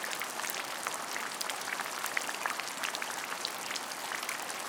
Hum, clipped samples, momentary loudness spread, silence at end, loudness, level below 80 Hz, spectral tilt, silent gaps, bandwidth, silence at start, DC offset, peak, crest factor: none; under 0.1%; 2 LU; 0 s; -35 LUFS; -88 dBFS; 0.5 dB/octave; none; 19 kHz; 0 s; under 0.1%; -12 dBFS; 24 dB